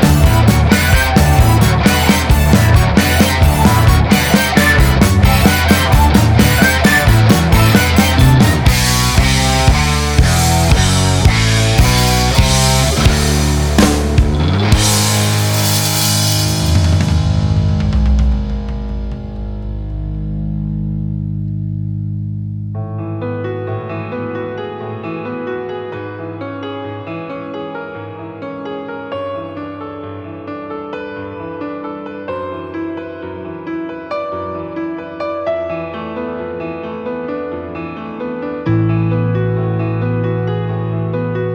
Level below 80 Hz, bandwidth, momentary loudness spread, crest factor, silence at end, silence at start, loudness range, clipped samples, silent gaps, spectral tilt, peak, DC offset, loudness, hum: -20 dBFS; over 20 kHz; 15 LU; 14 dB; 0 s; 0 s; 15 LU; under 0.1%; none; -5 dB/octave; 0 dBFS; under 0.1%; -14 LUFS; none